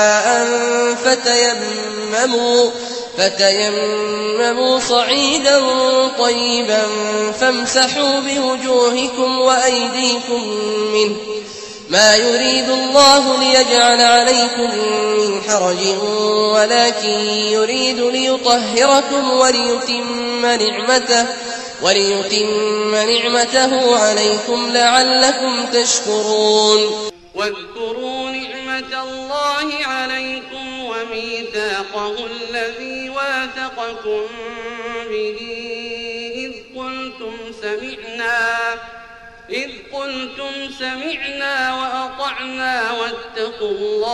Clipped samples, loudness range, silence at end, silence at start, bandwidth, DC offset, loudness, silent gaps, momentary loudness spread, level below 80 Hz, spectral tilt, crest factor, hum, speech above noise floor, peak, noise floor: under 0.1%; 11 LU; 0 s; 0 s; 13 kHz; under 0.1%; -15 LUFS; none; 14 LU; -54 dBFS; -1.5 dB/octave; 16 dB; none; 23 dB; 0 dBFS; -39 dBFS